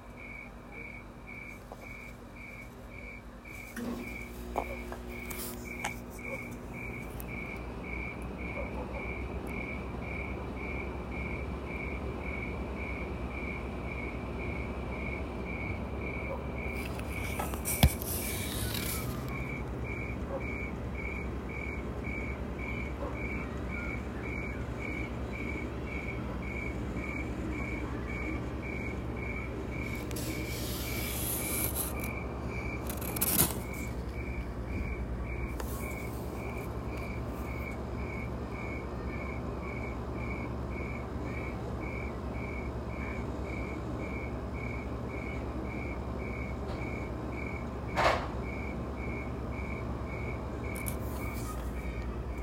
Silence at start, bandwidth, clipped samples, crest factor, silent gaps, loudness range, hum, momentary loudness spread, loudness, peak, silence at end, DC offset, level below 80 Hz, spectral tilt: 0 s; 16 kHz; under 0.1%; 30 dB; none; 6 LU; none; 6 LU; -37 LUFS; -6 dBFS; 0 s; under 0.1%; -42 dBFS; -5 dB/octave